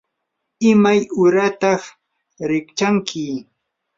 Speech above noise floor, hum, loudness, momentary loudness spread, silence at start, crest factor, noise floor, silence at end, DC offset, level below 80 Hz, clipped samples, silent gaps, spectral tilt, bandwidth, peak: 60 dB; none; -17 LUFS; 13 LU; 0.6 s; 16 dB; -76 dBFS; 0.55 s; under 0.1%; -62 dBFS; under 0.1%; none; -5.5 dB/octave; 7.6 kHz; -2 dBFS